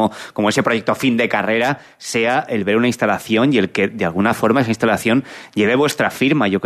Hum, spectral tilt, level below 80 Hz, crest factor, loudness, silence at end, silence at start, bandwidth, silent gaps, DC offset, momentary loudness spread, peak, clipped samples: none; -5 dB/octave; -56 dBFS; 16 dB; -17 LUFS; 0 s; 0 s; 13.5 kHz; none; under 0.1%; 4 LU; -2 dBFS; under 0.1%